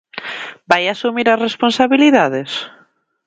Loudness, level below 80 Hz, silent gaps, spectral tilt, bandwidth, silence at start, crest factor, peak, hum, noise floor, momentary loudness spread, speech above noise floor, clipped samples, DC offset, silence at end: -15 LUFS; -60 dBFS; none; -4.5 dB/octave; 9 kHz; 0.15 s; 16 dB; 0 dBFS; none; -54 dBFS; 16 LU; 40 dB; under 0.1%; under 0.1%; 0.6 s